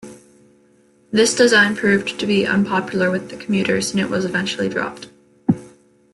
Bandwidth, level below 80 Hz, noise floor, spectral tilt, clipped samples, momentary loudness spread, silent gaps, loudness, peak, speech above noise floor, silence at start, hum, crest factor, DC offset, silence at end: 12 kHz; -58 dBFS; -55 dBFS; -4 dB/octave; under 0.1%; 12 LU; none; -18 LUFS; -2 dBFS; 37 dB; 0.05 s; none; 18 dB; under 0.1%; 0.45 s